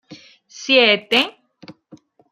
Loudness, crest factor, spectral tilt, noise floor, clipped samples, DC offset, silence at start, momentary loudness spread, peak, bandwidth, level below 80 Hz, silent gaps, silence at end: -15 LUFS; 20 dB; -2.5 dB/octave; -48 dBFS; under 0.1%; under 0.1%; 0.1 s; 13 LU; -2 dBFS; 15.5 kHz; -70 dBFS; none; 0.6 s